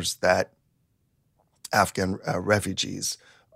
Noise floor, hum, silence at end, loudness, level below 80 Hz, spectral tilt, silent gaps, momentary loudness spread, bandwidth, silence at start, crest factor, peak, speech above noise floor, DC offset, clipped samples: -70 dBFS; none; 0.4 s; -26 LUFS; -58 dBFS; -3.5 dB/octave; none; 10 LU; 16 kHz; 0 s; 22 dB; -6 dBFS; 44 dB; under 0.1%; under 0.1%